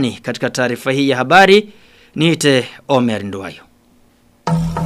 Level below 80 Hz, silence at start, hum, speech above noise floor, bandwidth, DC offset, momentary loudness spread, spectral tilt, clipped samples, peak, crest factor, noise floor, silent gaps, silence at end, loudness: -42 dBFS; 0 s; none; 37 dB; 15.5 kHz; under 0.1%; 17 LU; -5 dB/octave; under 0.1%; 0 dBFS; 16 dB; -52 dBFS; none; 0 s; -14 LUFS